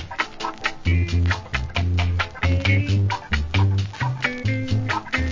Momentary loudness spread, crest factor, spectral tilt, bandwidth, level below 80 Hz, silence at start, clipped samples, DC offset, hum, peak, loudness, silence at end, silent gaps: 6 LU; 16 dB; -6 dB/octave; 7.6 kHz; -28 dBFS; 0 s; under 0.1%; 0.1%; none; -6 dBFS; -23 LUFS; 0 s; none